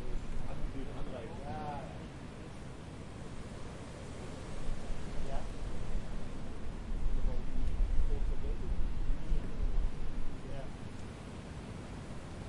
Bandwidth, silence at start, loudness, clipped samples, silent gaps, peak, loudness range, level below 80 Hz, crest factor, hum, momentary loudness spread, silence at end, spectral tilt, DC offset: 10.5 kHz; 0 s; -43 LUFS; under 0.1%; none; -16 dBFS; 6 LU; -36 dBFS; 18 dB; none; 8 LU; 0 s; -6.5 dB/octave; under 0.1%